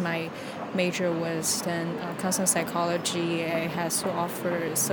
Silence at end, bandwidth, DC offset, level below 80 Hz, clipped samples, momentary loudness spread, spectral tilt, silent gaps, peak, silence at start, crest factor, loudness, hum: 0 s; 19.5 kHz; under 0.1%; -66 dBFS; under 0.1%; 7 LU; -3.5 dB/octave; none; -10 dBFS; 0 s; 18 dB; -27 LUFS; none